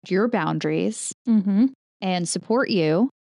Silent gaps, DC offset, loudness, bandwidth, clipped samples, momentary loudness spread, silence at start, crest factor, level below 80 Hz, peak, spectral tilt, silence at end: 1.14-1.25 s, 1.75-2.00 s; under 0.1%; -23 LUFS; 11.5 kHz; under 0.1%; 6 LU; 0.05 s; 12 dB; -74 dBFS; -10 dBFS; -5.5 dB/octave; 0.2 s